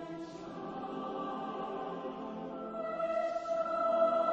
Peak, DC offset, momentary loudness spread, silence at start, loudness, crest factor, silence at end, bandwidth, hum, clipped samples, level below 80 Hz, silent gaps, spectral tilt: -18 dBFS; under 0.1%; 13 LU; 0 s; -36 LUFS; 16 dB; 0 s; 7.8 kHz; none; under 0.1%; -70 dBFS; none; -6.5 dB/octave